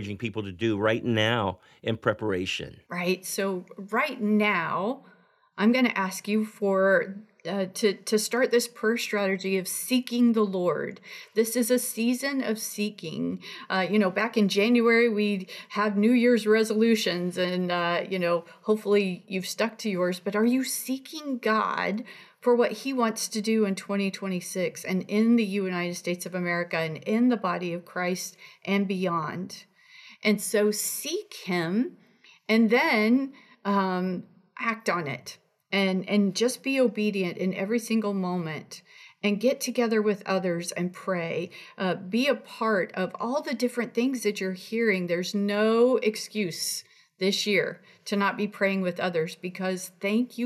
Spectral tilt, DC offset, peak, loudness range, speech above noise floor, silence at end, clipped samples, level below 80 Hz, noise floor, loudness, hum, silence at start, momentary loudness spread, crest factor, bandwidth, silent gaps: -4.5 dB/octave; under 0.1%; -8 dBFS; 4 LU; 26 dB; 0 s; under 0.1%; -78 dBFS; -52 dBFS; -26 LUFS; none; 0 s; 10 LU; 18 dB; 15 kHz; none